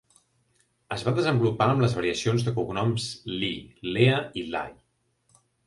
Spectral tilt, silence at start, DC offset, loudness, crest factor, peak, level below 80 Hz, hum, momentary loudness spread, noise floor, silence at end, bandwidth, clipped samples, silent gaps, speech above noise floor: -6 dB/octave; 0.9 s; under 0.1%; -26 LUFS; 22 dB; -6 dBFS; -56 dBFS; none; 10 LU; -70 dBFS; 0.95 s; 11.5 kHz; under 0.1%; none; 45 dB